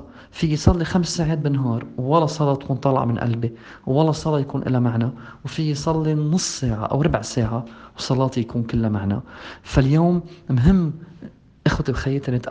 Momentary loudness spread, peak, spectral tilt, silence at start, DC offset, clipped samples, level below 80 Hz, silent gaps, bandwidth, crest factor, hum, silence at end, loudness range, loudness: 10 LU; 0 dBFS; -6.5 dB/octave; 0 s; under 0.1%; under 0.1%; -36 dBFS; none; 9.6 kHz; 20 dB; none; 0 s; 2 LU; -21 LUFS